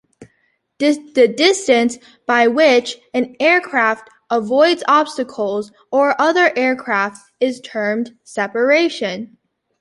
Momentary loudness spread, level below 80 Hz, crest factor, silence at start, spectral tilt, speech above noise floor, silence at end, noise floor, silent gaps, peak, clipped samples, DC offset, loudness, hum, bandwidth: 11 LU; -66 dBFS; 16 dB; 0.2 s; -3.5 dB/octave; 48 dB; 0.55 s; -64 dBFS; none; 0 dBFS; under 0.1%; under 0.1%; -16 LUFS; none; 11.5 kHz